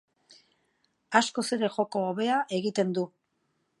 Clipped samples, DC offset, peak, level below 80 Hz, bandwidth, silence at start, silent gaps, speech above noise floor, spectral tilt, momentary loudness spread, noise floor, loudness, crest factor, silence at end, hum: under 0.1%; under 0.1%; -6 dBFS; -80 dBFS; 11.5 kHz; 1.1 s; none; 48 dB; -4.5 dB/octave; 4 LU; -76 dBFS; -28 LUFS; 24 dB; 0.75 s; none